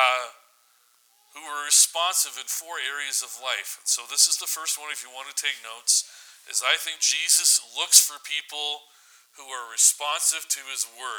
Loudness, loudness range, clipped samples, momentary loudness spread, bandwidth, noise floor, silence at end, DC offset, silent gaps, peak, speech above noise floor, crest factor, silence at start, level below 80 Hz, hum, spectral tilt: -22 LUFS; 4 LU; under 0.1%; 15 LU; over 20 kHz; -62 dBFS; 0 s; under 0.1%; none; 0 dBFS; 37 dB; 26 dB; 0 s; under -90 dBFS; none; 6 dB/octave